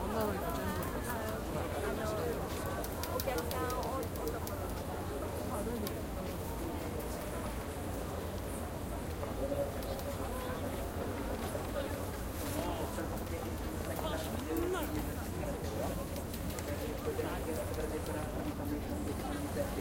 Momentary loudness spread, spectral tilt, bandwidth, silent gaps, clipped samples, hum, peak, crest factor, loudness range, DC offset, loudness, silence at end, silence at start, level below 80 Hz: 4 LU; -5.5 dB/octave; 17 kHz; none; under 0.1%; none; -16 dBFS; 22 dB; 2 LU; under 0.1%; -38 LUFS; 0 s; 0 s; -46 dBFS